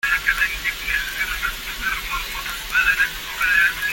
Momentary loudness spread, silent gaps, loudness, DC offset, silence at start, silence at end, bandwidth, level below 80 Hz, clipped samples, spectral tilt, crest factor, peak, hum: 9 LU; none; -20 LUFS; under 0.1%; 0.05 s; 0 s; 17 kHz; -38 dBFS; under 0.1%; 0 dB/octave; 18 dB; -4 dBFS; none